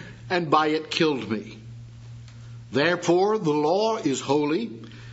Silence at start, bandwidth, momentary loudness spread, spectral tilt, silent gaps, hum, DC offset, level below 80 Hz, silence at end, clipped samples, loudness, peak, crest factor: 0 s; 8 kHz; 22 LU; -5 dB/octave; none; none; under 0.1%; -60 dBFS; 0 s; under 0.1%; -24 LUFS; -6 dBFS; 20 dB